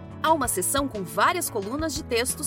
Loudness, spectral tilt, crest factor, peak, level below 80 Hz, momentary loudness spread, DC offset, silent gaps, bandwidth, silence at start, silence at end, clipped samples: -25 LUFS; -3 dB/octave; 18 dB; -8 dBFS; -46 dBFS; 6 LU; under 0.1%; none; 17 kHz; 0 s; 0 s; under 0.1%